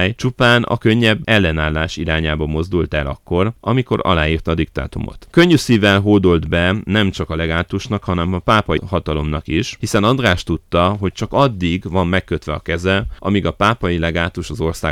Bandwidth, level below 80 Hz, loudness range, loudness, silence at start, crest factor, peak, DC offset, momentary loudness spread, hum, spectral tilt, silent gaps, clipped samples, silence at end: 15 kHz; -32 dBFS; 3 LU; -17 LUFS; 0 s; 14 dB; -2 dBFS; under 0.1%; 8 LU; none; -6 dB/octave; none; under 0.1%; 0 s